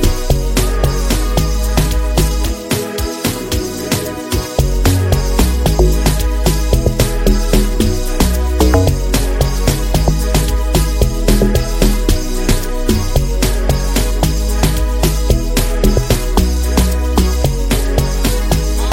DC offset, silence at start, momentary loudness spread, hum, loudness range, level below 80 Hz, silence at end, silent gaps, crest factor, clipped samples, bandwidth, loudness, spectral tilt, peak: under 0.1%; 0 s; 4 LU; none; 2 LU; -14 dBFS; 0 s; none; 12 dB; under 0.1%; 16.5 kHz; -15 LUFS; -5 dB/octave; 0 dBFS